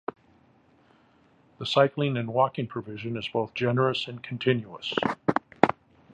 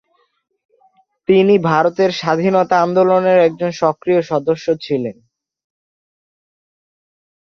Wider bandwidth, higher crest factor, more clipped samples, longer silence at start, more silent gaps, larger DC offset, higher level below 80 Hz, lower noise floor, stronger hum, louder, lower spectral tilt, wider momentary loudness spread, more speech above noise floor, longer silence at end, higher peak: first, 9.6 kHz vs 7 kHz; first, 28 dB vs 16 dB; neither; first, 1.6 s vs 1.3 s; neither; neither; about the same, -64 dBFS vs -60 dBFS; first, -61 dBFS vs -57 dBFS; neither; second, -27 LUFS vs -15 LUFS; about the same, -6.5 dB/octave vs -6.5 dB/octave; first, 11 LU vs 7 LU; second, 34 dB vs 42 dB; second, 0.4 s vs 2.35 s; about the same, -2 dBFS vs 0 dBFS